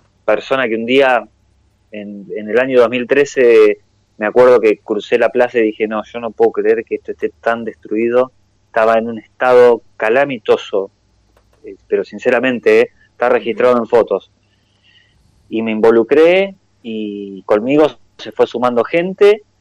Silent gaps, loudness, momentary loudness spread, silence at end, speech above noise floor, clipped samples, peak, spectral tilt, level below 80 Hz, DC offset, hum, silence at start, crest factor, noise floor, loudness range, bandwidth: none; -14 LUFS; 14 LU; 0.2 s; 44 dB; under 0.1%; -2 dBFS; -5.5 dB/octave; -56 dBFS; under 0.1%; none; 0.25 s; 12 dB; -57 dBFS; 4 LU; 8.8 kHz